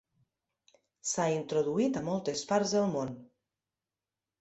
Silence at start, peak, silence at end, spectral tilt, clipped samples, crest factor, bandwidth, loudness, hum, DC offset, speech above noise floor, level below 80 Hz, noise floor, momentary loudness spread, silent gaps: 1.05 s; -16 dBFS; 1.15 s; -4.5 dB/octave; under 0.1%; 18 dB; 8.4 kHz; -31 LUFS; none; under 0.1%; over 59 dB; -70 dBFS; under -90 dBFS; 9 LU; none